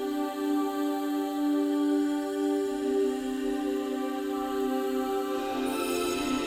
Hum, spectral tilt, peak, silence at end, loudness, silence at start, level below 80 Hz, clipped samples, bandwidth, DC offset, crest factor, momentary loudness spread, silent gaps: none; -3.5 dB/octave; -16 dBFS; 0 s; -29 LUFS; 0 s; -58 dBFS; under 0.1%; 16 kHz; under 0.1%; 12 dB; 4 LU; none